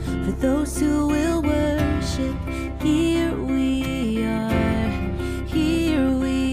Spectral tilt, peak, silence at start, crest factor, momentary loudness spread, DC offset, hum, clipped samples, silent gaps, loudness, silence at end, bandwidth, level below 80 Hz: -6 dB/octave; -8 dBFS; 0 s; 14 dB; 5 LU; under 0.1%; none; under 0.1%; none; -22 LUFS; 0 s; 15.5 kHz; -32 dBFS